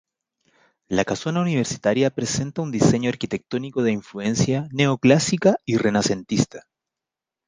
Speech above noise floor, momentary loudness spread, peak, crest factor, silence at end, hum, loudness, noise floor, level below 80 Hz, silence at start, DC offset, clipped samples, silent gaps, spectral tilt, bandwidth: 66 dB; 9 LU; -2 dBFS; 20 dB; 0.85 s; none; -22 LUFS; -87 dBFS; -52 dBFS; 0.9 s; under 0.1%; under 0.1%; none; -5.5 dB/octave; 10 kHz